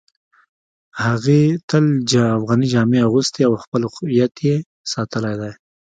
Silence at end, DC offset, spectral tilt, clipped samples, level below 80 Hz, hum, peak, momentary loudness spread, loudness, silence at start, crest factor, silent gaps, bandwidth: 0.4 s; under 0.1%; -6 dB/octave; under 0.1%; -54 dBFS; none; -2 dBFS; 9 LU; -18 LUFS; 0.95 s; 16 dB; 1.63-1.68 s, 3.67-3.72 s, 4.66-4.84 s; 9.2 kHz